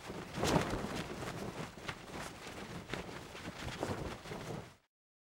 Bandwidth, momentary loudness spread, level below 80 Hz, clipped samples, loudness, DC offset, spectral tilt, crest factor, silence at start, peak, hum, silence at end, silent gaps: 19 kHz; 13 LU; -56 dBFS; under 0.1%; -41 LUFS; under 0.1%; -4.5 dB/octave; 26 dB; 0 s; -16 dBFS; none; 0.6 s; none